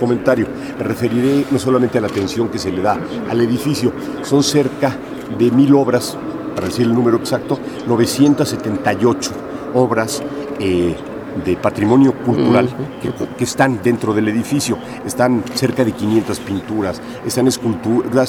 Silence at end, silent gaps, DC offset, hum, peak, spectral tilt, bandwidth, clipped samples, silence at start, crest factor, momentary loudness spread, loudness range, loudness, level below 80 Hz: 0 s; none; under 0.1%; none; 0 dBFS; -5.5 dB/octave; 18 kHz; under 0.1%; 0 s; 16 dB; 10 LU; 2 LU; -17 LUFS; -48 dBFS